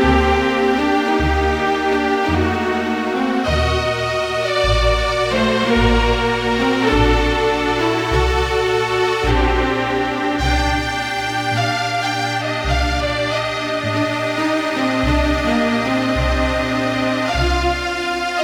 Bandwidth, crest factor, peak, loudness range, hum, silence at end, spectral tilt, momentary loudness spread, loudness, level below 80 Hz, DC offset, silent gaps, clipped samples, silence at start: 16.5 kHz; 14 dB; -2 dBFS; 3 LU; none; 0 s; -5 dB/octave; 4 LU; -17 LUFS; -26 dBFS; under 0.1%; none; under 0.1%; 0 s